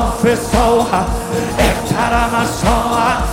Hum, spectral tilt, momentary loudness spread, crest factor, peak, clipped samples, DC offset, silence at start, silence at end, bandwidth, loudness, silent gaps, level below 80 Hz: none; -5 dB/octave; 4 LU; 14 dB; 0 dBFS; under 0.1%; under 0.1%; 0 s; 0 s; 17 kHz; -15 LUFS; none; -24 dBFS